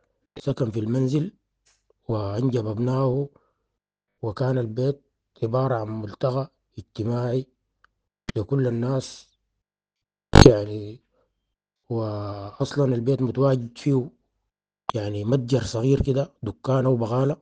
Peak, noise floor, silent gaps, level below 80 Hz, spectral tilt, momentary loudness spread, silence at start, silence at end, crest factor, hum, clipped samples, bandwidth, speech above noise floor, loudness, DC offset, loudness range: 0 dBFS; -87 dBFS; none; -38 dBFS; -7 dB/octave; 12 LU; 0.35 s; 0.05 s; 24 dB; none; under 0.1%; 9.4 kHz; 64 dB; -24 LUFS; under 0.1%; 7 LU